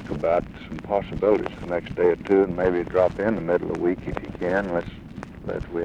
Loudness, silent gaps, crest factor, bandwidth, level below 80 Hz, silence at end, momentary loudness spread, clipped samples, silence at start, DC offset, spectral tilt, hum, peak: -24 LUFS; none; 16 dB; 9 kHz; -44 dBFS; 0 s; 14 LU; under 0.1%; 0 s; under 0.1%; -8 dB/octave; none; -8 dBFS